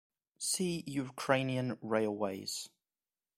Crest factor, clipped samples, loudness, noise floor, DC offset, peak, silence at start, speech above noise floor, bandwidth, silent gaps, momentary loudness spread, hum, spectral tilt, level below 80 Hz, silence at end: 24 dB; under 0.1%; -35 LUFS; under -90 dBFS; under 0.1%; -12 dBFS; 0.4 s; over 55 dB; 16 kHz; none; 8 LU; none; -4 dB/octave; -72 dBFS; 0.7 s